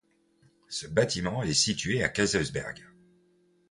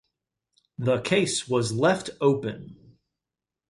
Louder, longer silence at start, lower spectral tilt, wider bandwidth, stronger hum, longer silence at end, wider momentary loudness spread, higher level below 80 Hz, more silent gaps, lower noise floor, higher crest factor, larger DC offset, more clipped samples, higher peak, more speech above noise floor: second, -28 LUFS vs -25 LUFS; about the same, 0.7 s vs 0.8 s; second, -3.5 dB/octave vs -5 dB/octave; about the same, 11.5 kHz vs 11.5 kHz; neither; about the same, 0.85 s vs 0.95 s; about the same, 13 LU vs 12 LU; first, -54 dBFS vs -62 dBFS; neither; second, -66 dBFS vs -89 dBFS; about the same, 22 dB vs 18 dB; neither; neither; about the same, -8 dBFS vs -8 dBFS; second, 38 dB vs 64 dB